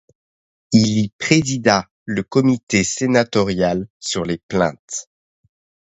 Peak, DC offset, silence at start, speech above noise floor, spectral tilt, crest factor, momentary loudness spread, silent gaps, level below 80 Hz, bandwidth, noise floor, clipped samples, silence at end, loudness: 0 dBFS; under 0.1%; 0.7 s; over 72 dB; -4.5 dB/octave; 18 dB; 9 LU; 1.13-1.19 s, 1.91-2.06 s, 2.63-2.67 s, 3.90-4.00 s, 4.43-4.49 s, 4.79-4.88 s; -48 dBFS; 8.2 kHz; under -90 dBFS; under 0.1%; 0.85 s; -18 LUFS